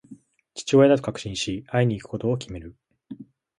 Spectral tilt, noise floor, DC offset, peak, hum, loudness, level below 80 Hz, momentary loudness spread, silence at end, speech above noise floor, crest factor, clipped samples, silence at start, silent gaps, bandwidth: -6 dB/octave; -49 dBFS; under 0.1%; -6 dBFS; none; -23 LUFS; -52 dBFS; 25 LU; 0.35 s; 27 dB; 18 dB; under 0.1%; 0.1 s; none; 11 kHz